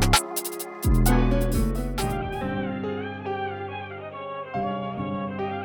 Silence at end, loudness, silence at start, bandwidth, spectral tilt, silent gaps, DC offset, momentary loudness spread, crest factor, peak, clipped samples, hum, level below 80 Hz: 0 s; -27 LUFS; 0 s; 19.5 kHz; -5 dB/octave; none; under 0.1%; 13 LU; 20 dB; -6 dBFS; under 0.1%; none; -30 dBFS